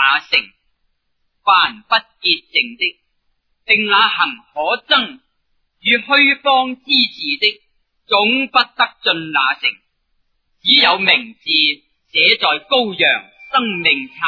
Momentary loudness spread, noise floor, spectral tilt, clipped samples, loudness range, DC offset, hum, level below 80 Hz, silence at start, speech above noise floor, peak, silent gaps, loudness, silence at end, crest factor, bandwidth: 9 LU; -68 dBFS; -4 dB/octave; under 0.1%; 3 LU; under 0.1%; none; -60 dBFS; 0 s; 52 dB; 0 dBFS; none; -14 LUFS; 0 s; 18 dB; 5.4 kHz